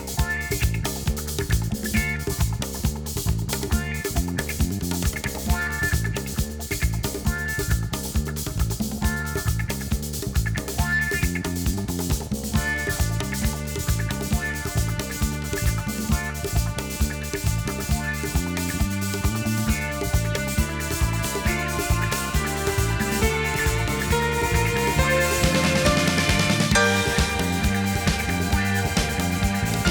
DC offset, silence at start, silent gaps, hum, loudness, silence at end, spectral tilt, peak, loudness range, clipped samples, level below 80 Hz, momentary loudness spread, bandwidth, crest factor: under 0.1%; 0 s; none; none; -24 LUFS; 0 s; -4.5 dB/octave; -4 dBFS; 6 LU; under 0.1%; -30 dBFS; 7 LU; over 20 kHz; 20 dB